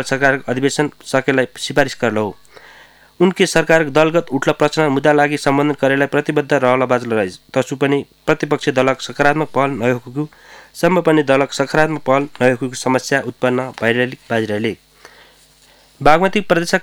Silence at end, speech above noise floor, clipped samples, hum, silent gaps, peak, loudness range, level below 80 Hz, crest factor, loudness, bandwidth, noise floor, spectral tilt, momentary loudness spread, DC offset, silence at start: 0 s; 34 dB; under 0.1%; none; none; 0 dBFS; 4 LU; -46 dBFS; 16 dB; -16 LUFS; 17.5 kHz; -49 dBFS; -5 dB/octave; 7 LU; under 0.1%; 0 s